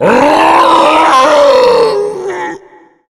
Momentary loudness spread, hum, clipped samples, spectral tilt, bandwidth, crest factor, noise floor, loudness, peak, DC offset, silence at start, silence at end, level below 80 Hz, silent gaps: 12 LU; none; 2%; -4 dB/octave; 15 kHz; 8 dB; -40 dBFS; -7 LUFS; 0 dBFS; under 0.1%; 0 s; 0.55 s; -44 dBFS; none